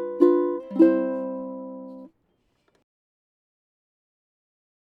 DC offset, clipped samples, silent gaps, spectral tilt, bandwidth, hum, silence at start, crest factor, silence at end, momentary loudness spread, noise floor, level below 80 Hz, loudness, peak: under 0.1%; under 0.1%; none; -9.5 dB/octave; 4.6 kHz; none; 0 s; 22 dB; 2.75 s; 20 LU; -70 dBFS; -76 dBFS; -22 LUFS; -4 dBFS